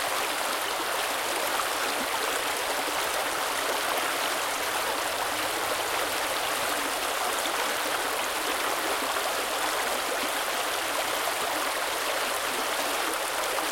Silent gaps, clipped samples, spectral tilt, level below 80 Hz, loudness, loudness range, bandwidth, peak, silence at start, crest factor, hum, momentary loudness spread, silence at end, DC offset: none; under 0.1%; 0 dB/octave; -60 dBFS; -27 LUFS; 0 LU; 17 kHz; -12 dBFS; 0 s; 16 dB; none; 1 LU; 0 s; under 0.1%